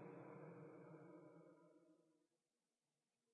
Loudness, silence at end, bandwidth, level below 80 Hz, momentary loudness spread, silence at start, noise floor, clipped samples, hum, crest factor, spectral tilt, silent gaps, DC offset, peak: -62 LUFS; 1.1 s; 3.6 kHz; under -90 dBFS; 8 LU; 0 s; under -90 dBFS; under 0.1%; none; 16 dB; -5.5 dB/octave; none; under 0.1%; -48 dBFS